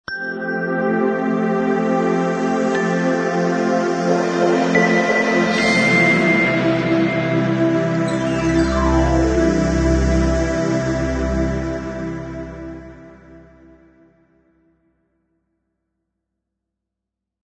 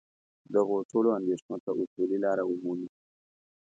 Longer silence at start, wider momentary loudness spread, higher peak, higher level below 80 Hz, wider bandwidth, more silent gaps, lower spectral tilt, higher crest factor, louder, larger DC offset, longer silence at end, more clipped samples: second, 0.1 s vs 0.5 s; about the same, 10 LU vs 8 LU; first, -2 dBFS vs -12 dBFS; first, -30 dBFS vs -80 dBFS; first, 9.4 kHz vs 7.8 kHz; second, none vs 0.85-0.89 s, 1.42-1.49 s, 1.60-1.67 s, 1.87-1.96 s; second, -6 dB/octave vs -8 dB/octave; about the same, 18 dB vs 18 dB; first, -18 LUFS vs -30 LUFS; neither; first, 4.1 s vs 0.9 s; neither